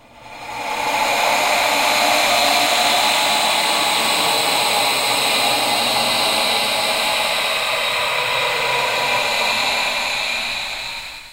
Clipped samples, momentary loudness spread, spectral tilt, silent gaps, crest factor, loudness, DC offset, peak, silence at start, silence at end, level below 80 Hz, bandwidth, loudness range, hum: under 0.1%; 7 LU; -0.5 dB/octave; none; 16 dB; -16 LUFS; under 0.1%; -2 dBFS; 0.15 s; 0 s; -52 dBFS; 16 kHz; 3 LU; none